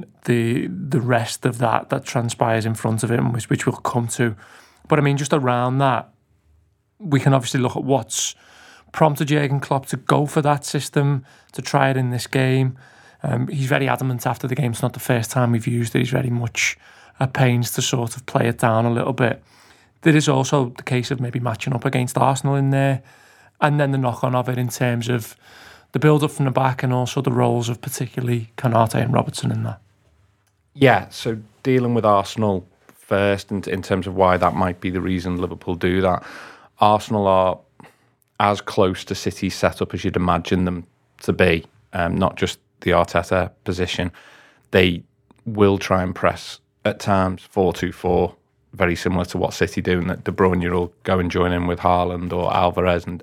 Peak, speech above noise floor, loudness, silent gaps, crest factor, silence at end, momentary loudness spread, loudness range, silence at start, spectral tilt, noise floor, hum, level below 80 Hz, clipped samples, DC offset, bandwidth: 0 dBFS; 43 dB; -20 LUFS; none; 20 dB; 0 s; 8 LU; 2 LU; 0 s; -6 dB/octave; -63 dBFS; none; -48 dBFS; under 0.1%; under 0.1%; 16.5 kHz